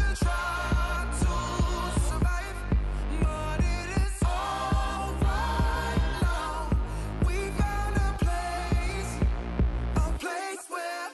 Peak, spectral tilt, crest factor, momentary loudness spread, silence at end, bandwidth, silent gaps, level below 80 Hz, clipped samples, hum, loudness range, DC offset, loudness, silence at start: -18 dBFS; -5.5 dB/octave; 10 dB; 4 LU; 0 s; 12.5 kHz; none; -30 dBFS; under 0.1%; none; 1 LU; under 0.1%; -29 LUFS; 0 s